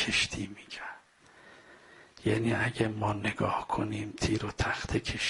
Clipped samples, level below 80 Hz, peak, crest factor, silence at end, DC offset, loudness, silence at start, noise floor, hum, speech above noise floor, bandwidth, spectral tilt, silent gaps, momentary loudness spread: under 0.1%; -50 dBFS; -12 dBFS; 20 dB; 0 s; under 0.1%; -32 LUFS; 0 s; -58 dBFS; none; 27 dB; 11.5 kHz; -4.5 dB/octave; none; 13 LU